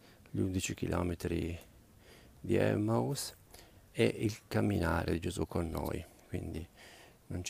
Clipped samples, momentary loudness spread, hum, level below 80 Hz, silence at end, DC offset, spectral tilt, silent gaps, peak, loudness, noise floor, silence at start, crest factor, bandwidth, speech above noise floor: under 0.1%; 14 LU; none; -52 dBFS; 0 s; under 0.1%; -6 dB/octave; none; -16 dBFS; -35 LUFS; -59 dBFS; 0.05 s; 20 dB; 15.5 kHz; 25 dB